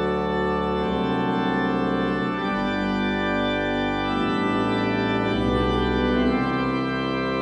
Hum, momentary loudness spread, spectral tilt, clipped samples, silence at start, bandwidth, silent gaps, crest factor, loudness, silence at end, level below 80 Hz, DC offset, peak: none; 2 LU; -7 dB/octave; under 0.1%; 0 s; 9.4 kHz; none; 14 dB; -23 LUFS; 0 s; -38 dBFS; under 0.1%; -10 dBFS